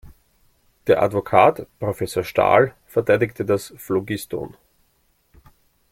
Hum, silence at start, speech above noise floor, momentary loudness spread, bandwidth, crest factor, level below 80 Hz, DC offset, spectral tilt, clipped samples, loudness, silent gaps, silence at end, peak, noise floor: none; 0.85 s; 45 dB; 13 LU; 16.5 kHz; 20 dB; -54 dBFS; under 0.1%; -6 dB/octave; under 0.1%; -20 LUFS; none; 1.45 s; -2 dBFS; -64 dBFS